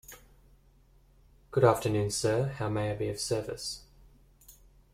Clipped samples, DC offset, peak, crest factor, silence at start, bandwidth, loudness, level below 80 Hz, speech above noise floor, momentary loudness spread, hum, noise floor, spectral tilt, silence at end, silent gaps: under 0.1%; under 0.1%; -8 dBFS; 24 dB; 0.1 s; 16 kHz; -30 LUFS; -56 dBFS; 32 dB; 13 LU; none; -61 dBFS; -5 dB/octave; 0.4 s; none